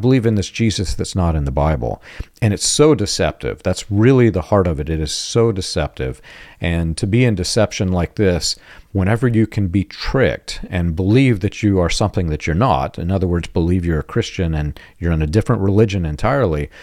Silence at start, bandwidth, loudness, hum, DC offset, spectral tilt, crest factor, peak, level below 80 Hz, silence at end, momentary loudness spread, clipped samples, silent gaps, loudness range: 0 s; 14 kHz; -18 LUFS; none; under 0.1%; -5.5 dB/octave; 16 dB; 0 dBFS; -32 dBFS; 0 s; 8 LU; under 0.1%; none; 3 LU